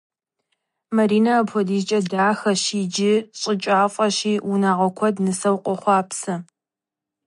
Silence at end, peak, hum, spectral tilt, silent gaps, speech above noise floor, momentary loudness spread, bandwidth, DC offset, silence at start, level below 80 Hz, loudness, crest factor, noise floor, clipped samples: 0.85 s; -6 dBFS; none; -4.5 dB/octave; none; 68 dB; 6 LU; 11.5 kHz; under 0.1%; 0.9 s; -72 dBFS; -20 LUFS; 16 dB; -88 dBFS; under 0.1%